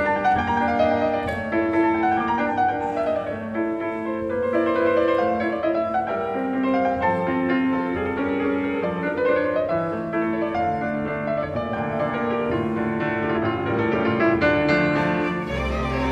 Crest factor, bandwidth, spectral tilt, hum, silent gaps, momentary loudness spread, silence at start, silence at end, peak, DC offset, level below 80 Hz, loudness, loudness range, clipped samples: 16 dB; 8.8 kHz; -7.5 dB/octave; none; none; 6 LU; 0 s; 0 s; -6 dBFS; under 0.1%; -44 dBFS; -23 LUFS; 3 LU; under 0.1%